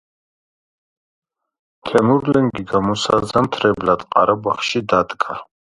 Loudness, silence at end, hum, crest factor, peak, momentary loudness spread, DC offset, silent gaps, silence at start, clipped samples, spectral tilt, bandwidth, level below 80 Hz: -17 LUFS; 0.35 s; none; 18 dB; 0 dBFS; 7 LU; under 0.1%; none; 1.85 s; under 0.1%; -5.5 dB/octave; 11.5 kHz; -50 dBFS